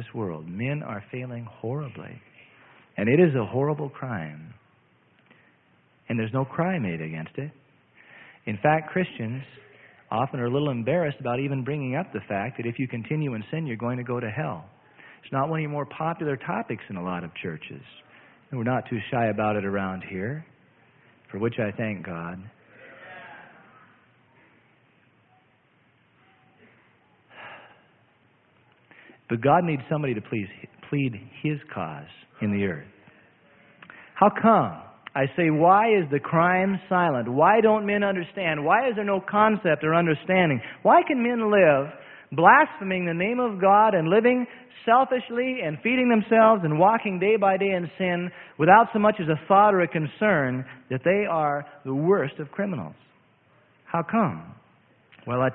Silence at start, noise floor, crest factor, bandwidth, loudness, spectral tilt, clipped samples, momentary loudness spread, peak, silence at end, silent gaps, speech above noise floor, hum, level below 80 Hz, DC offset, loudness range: 0 s; -63 dBFS; 24 dB; 4.1 kHz; -24 LUFS; -11.5 dB/octave; under 0.1%; 17 LU; -2 dBFS; 0 s; none; 39 dB; none; -64 dBFS; under 0.1%; 11 LU